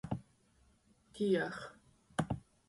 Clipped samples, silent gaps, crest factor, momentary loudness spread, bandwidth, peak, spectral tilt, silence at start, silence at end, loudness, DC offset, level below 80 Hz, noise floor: under 0.1%; none; 22 dB; 17 LU; 11.5 kHz; -20 dBFS; -6.5 dB/octave; 0.05 s; 0.3 s; -38 LUFS; under 0.1%; -62 dBFS; -70 dBFS